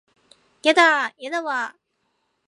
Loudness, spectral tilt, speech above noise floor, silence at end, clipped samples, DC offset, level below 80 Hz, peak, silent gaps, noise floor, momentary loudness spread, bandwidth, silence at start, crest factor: -20 LUFS; -0.5 dB/octave; 52 dB; 0.8 s; under 0.1%; under 0.1%; -84 dBFS; -2 dBFS; none; -72 dBFS; 12 LU; 11.5 kHz; 0.65 s; 20 dB